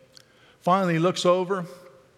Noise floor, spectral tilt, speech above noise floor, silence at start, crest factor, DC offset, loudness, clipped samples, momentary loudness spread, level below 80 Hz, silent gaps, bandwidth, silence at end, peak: -54 dBFS; -5.5 dB/octave; 32 dB; 0.65 s; 16 dB; under 0.1%; -23 LUFS; under 0.1%; 10 LU; -76 dBFS; none; 14 kHz; 0.45 s; -8 dBFS